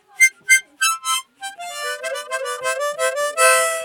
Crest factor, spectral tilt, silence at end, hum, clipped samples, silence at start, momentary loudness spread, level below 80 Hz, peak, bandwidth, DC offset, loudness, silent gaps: 20 dB; 3.5 dB/octave; 0 s; none; under 0.1%; 0.2 s; 13 LU; -84 dBFS; 0 dBFS; 19 kHz; under 0.1%; -18 LUFS; none